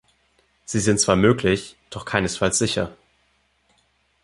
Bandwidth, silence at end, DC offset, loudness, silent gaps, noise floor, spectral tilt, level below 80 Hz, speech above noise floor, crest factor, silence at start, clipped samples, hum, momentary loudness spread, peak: 11.5 kHz; 1.3 s; under 0.1%; -21 LUFS; none; -65 dBFS; -4 dB/octave; -46 dBFS; 44 dB; 22 dB; 0.7 s; under 0.1%; none; 16 LU; -2 dBFS